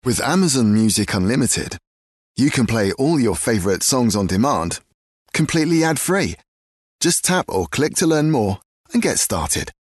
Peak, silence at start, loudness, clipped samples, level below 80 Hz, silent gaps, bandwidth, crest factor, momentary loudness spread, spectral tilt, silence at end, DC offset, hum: -6 dBFS; 0.05 s; -18 LUFS; under 0.1%; -44 dBFS; 1.87-2.35 s, 4.94-5.26 s, 6.48-6.99 s, 8.65-8.84 s; 12.5 kHz; 14 dB; 8 LU; -4.5 dB/octave; 0.3 s; under 0.1%; none